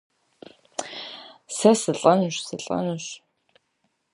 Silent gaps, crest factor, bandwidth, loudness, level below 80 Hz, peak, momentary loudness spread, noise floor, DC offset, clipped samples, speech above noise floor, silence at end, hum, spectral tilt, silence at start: none; 22 dB; 11.5 kHz; -23 LUFS; -70 dBFS; -2 dBFS; 18 LU; -73 dBFS; under 0.1%; under 0.1%; 51 dB; 0.95 s; none; -4.5 dB/octave; 0.8 s